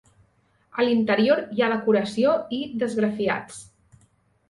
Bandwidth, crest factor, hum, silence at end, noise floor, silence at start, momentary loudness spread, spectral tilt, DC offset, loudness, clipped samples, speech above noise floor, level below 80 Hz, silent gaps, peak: 11.5 kHz; 18 dB; none; 0.85 s; -64 dBFS; 0.75 s; 10 LU; -5.5 dB/octave; under 0.1%; -23 LUFS; under 0.1%; 42 dB; -66 dBFS; none; -8 dBFS